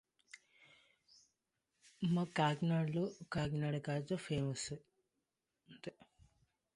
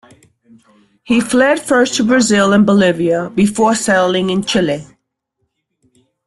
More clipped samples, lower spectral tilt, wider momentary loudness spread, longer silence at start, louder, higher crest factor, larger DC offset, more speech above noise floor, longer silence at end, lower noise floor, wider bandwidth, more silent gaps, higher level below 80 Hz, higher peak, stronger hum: neither; first, -6 dB/octave vs -4.5 dB/octave; first, 19 LU vs 6 LU; second, 0.35 s vs 1.05 s; second, -39 LUFS vs -13 LUFS; first, 22 dB vs 14 dB; neither; second, 51 dB vs 57 dB; second, 0.85 s vs 1.45 s; first, -88 dBFS vs -70 dBFS; second, 11 kHz vs 12.5 kHz; neither; second, -68 dBFS vs -50 dBFS; second, -20 dBFS vs -2 dBFS; neither